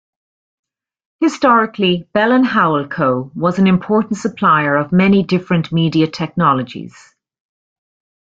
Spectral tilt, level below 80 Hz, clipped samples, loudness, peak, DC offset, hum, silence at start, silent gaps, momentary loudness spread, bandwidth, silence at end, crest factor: -7 dB/octave; -54 dBFS; under 0.1%; -15 LUFS; 0 dBFS; under 0.1%; none; 1.2 s; none; 6 LU; 7.8 kHz; 1.5 s; 14 dB